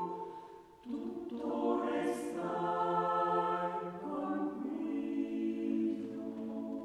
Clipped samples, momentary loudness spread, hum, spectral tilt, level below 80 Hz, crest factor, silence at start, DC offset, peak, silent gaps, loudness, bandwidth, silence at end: under 0.1%; 10 LU; none; -6.5 dB/octave; -74 dBFS; 14 dB; 0 s; under 0.1%; -22 dBFS; none; -36 LUFS; 12.5 kHz; 0 s